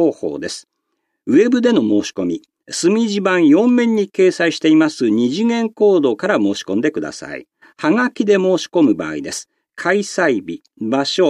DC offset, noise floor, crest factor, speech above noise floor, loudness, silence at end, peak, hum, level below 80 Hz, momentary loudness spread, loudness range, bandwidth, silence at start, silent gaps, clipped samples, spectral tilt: under 0.1%; -73 dBFS; 14 dB; 57 dB; -16 LUFS; 0 s; -2 dBFS; none; -64 dBFS; 13 LU; 3 LU; 11.5 kHz; 0 s; none; under 0.1%; -5 dB/octave